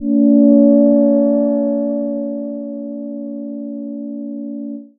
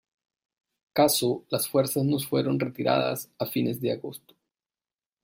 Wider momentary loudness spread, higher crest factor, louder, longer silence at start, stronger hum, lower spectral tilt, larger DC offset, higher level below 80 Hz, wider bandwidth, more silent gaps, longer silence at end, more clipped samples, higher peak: first, 17 LU vs 9 LU; second, 14 dB vs 20 dB; first, -14 LUFS vs -26 LUFS; second, 0 s vs 0.95 s; neither; first, -15.5 dB/octave vs -5 dB/octave; neither; first, -58 dBFS vs -68 dBFS; second, 1.8 kHz vs 16.5 kHz; neither; second, 0.15 s vs 1.05 s; neither; first, 0 dBFS vs -8 dBFS